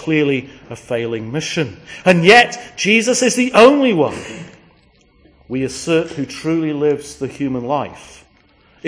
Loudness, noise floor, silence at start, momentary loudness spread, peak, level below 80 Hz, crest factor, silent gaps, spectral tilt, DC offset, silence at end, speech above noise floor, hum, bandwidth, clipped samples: -15 LUFS; -52 dBFS; 0 s; 17 LU; 0 dBFS; -52 dBFS; 16 dB; none; -4.5 dB/octave; under 0.1%; 0 s; 37 dB; none; 11 kHz; 0.1%